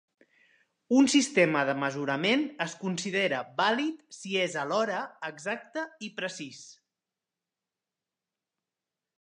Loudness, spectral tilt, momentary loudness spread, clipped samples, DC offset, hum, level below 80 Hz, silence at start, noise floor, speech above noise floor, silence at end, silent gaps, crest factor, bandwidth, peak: -28 LUFS; -4 dB/octave; 14 LU; under 0.1%; under 0.1%; none; -82 dBFS; 0.9 s; -90 dBFS; 61 dB; 2.5 s; none; 22 dB; 10.5 kHz; -10 dBFS